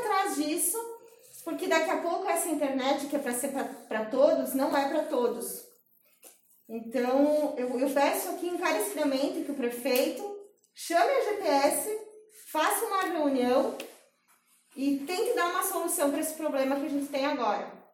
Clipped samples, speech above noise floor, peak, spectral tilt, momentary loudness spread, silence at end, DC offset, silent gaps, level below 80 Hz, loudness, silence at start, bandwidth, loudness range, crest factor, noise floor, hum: under 0.1%; 38 dB; -10 dBFS; -2 dB/octave; 11 LU; 0.15 s; under 0.1%; none; -80 dBFS; -29 LUFS; 0 s; 17 kHz; 2 LU; 20 dB; -66 dBFS; none